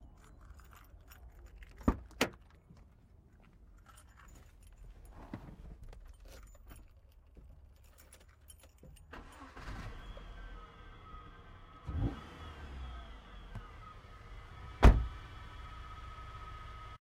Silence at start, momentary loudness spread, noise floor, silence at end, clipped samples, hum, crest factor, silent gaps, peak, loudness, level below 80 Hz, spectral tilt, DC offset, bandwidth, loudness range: 0 s; 23 LU; -61 dBFS; 0.05 s; under 0.1%; none; 30 dB; none; -8 dBFS; -38 LUFS; -40 dBFS; -6 dB/octave; under 0.1%; 16 kHz; 21 LU